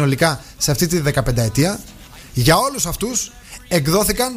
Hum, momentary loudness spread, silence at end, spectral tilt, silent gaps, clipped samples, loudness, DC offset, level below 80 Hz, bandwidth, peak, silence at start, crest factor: none; 13 LU; 0 s; -4 dB/octave; none; under 0.1%; -18 LUFS; under 0.1%; -34 dBFS; 15.5 kHz; 0 dBFS; 0 s; 18 dB